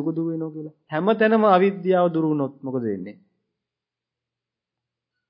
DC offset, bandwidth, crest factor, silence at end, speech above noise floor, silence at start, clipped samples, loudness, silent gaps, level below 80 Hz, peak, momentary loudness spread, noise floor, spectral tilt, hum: under 0.1%; 5.4 kHz; 20 dB; 2.15 s; 66 dB; 0 s; under 0.1%; -21 LUFS; none; -74 dBFS; -4 dBFS; 16 LU; -87 dBFS; -11.5 dB/octave; none